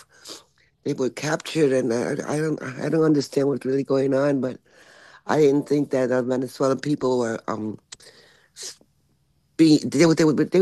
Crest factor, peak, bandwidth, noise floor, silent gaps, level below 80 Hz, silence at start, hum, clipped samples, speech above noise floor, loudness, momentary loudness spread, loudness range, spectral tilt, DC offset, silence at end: 18 dB; -6 dBFS; 12.5 kHz; -65 dBFS; none; -66 dBFS; 0.25 s; none; under 0.1%; 44 dB; -22 LUFS; 19 LU; 4 LU; -6 dB/octave; under 0.1%; 0 s